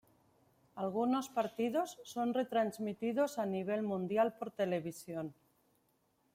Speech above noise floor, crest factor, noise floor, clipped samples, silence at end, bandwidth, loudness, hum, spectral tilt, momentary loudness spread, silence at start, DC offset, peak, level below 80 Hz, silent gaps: 40 dB; 16 dB; -76 dBFS; under 0.1%; 1.05 s; 16.5 kHz; -37 LUFS; none; -6 dB/octave; 9 LU; 0.75 s; under 0.1%; -20 dBFS; -80 dBFS; none